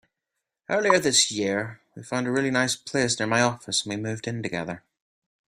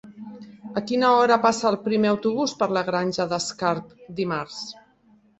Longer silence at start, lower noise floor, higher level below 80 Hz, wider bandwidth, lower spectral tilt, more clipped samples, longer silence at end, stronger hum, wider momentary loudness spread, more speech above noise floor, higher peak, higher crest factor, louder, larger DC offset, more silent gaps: first, 0.7 s vs 0.05 s; first, -84 dBFS vs -58 dBFS; about the same, -64 dBFS vs -64 dBFS; first, 15.5 kHz vs 8.2 kHz; second, -3 dB/octave vs -4.5 dB/octave; neither; about the same, 0.7 s vs 0.65 s; neither; second, 12 LU vs 19 LU; first, 59 dB vs 36 dB; about the same, -4 dBFS vs -4 dBFS; about the same, 22 dB vs 20 dB; about the same, -24 LUFS vs -23 LUFS; neither; neither